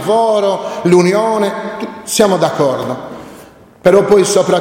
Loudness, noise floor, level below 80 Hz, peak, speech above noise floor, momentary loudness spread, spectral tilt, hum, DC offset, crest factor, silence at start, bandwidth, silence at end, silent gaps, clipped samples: -13 LUFS; -39 dBFS; -50 dBFS; 0 dBFS; 27 dB; 14 LU; -5 dB/octave; none; under 0.1%; 12 dB; 0 s; 16.5 kHz; 0 s; none; under 0.1%